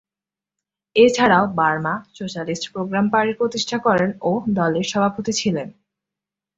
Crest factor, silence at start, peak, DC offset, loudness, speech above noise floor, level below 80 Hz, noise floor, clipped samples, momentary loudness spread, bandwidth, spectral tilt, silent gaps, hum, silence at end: 18 dB; 0.95 s; -2 dBFS; under 0.1%; -19 LUFS; 70 dB; -58 dBFS; -89 dBFS; under 0.1%; 11 LU; 8 kHz; -5 dB/octave; none; 50 Hz at -40 dBFS; 0.85 s